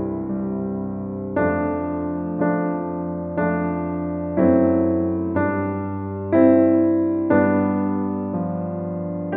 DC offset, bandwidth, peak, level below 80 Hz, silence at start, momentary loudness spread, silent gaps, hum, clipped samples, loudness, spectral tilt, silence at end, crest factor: under 0.1%; 2.8 kHz; -4 dBFS; -50 dBFS; 0 s; 10 LU; none; none; under 0.1%; -21 LUFS; -13.5 dB/octave; 0 s; 16 dB